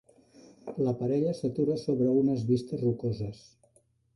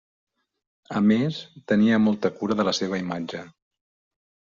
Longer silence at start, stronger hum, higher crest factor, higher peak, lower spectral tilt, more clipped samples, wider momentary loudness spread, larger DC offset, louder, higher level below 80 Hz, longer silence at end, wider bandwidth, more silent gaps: second, 0.65 s vs 0.9 s; neither; about the same, 14 dB vs 16 dB; second, -16 dBFS vs -8 dBFS; first, -9 dB/octave vs -5 dB/octave; neither; about the same, 11 LU vs 13 LU; neither; second, -29 LUFS vs -23 LUFS; about the same, -62 dBFS vs -64 dBFS; second, 0.8 s vs 1.1 s; first, 11.5 kHz vs 7.4 kHz; neither